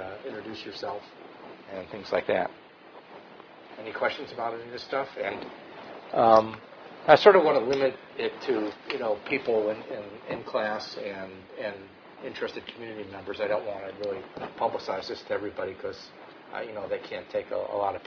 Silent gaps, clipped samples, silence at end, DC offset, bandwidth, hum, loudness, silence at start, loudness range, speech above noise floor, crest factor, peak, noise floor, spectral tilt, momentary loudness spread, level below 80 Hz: none; under 0.1%; 0 s; under 0.1%; 5.4 kHz; none; -28 LUFS; 0 s; 12 LU; 22 dB; 26 dB; -2 dBFS; -50 dBFS; -5.5 dB/octave; 22 LU; -68 dBFS